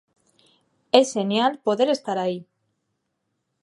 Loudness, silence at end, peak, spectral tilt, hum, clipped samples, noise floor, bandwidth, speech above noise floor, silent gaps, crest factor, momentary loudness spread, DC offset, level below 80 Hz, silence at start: -22 LUFS; 1.2 s; 0 dBFS; -4.5 dB/octave; none; under 0.1%; -76 dBFS; 11.5 kHz; 55 dB; none; 24 dB; 8 LU; under 0.1%; -76 dBFS; 0.95 s